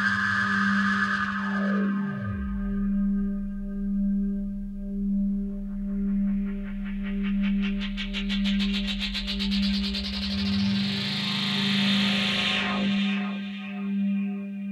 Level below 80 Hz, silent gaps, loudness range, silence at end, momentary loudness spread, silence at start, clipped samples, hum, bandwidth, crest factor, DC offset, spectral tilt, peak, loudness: -40 dBFS; none; 4 LU; 0 s; 9 LU; 0 s; under 0.1%; none; 11 kHz; 14 dB; under 0.1%; -5.5 dB/octave; -12 dBFS; -27 LUFS